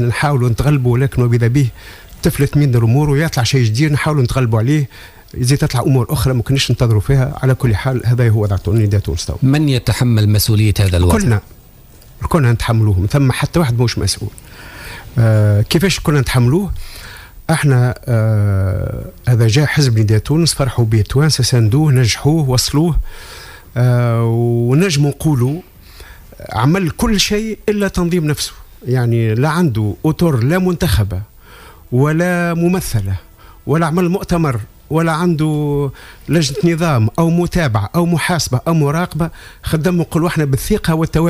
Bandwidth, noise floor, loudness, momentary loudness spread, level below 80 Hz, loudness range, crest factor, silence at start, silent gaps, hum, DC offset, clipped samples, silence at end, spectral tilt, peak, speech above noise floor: 16 kHz; -41 dBFS; -15 LUFS; 9 LU; -32 dBFS; 3 LU; 12 dB; 0 s; none; none; under 0.1%; under 0.1%; 0 s; -6 dB/octave; -2 dBFS; 27 dB